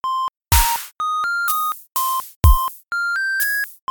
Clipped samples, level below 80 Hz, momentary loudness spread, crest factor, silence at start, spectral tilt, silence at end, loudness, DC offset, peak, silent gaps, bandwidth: under 0.1%; -24 dBFS; 7 LU; 18 dB; 0.05 s; -2.5 dB/octave; 0.15 s; -19 LUFS; under 0.1%; 0 dBFS; 2.36-2.41 s; 19.5 kHz